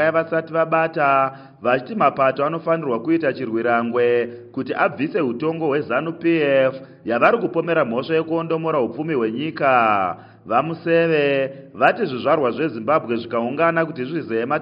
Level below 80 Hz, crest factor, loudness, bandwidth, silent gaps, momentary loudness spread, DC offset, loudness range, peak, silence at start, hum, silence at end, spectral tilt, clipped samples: -68 dBFS; 18 dB; -20 LUFS; 5.4 kHz; none; 7 LU; under 0.1%; 2 LU; -2 dBFS; 0 s; none; 0 s; -4.5 dB/octave; under 0.1%